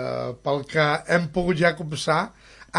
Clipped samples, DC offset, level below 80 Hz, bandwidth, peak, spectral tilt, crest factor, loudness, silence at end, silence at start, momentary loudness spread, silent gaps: under 0.1%; under 0.1%; -50 dBFS; 11.5 kHz; -6 dBFS; -5.5 dB/octave; 18 dB; -23 LUFS; 0 s; 0 s; 8 LU; none